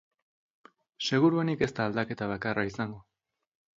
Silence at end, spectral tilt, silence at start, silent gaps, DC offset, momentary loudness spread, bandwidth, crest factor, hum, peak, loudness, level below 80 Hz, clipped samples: 0.75 s; -6 dB/octave; 1 s; none; under 0.1%; 12 LU; 7.8 kHz; 20 dB; none; -12 dBFS; -29 LUFS; -62 dBFS; under 0.1%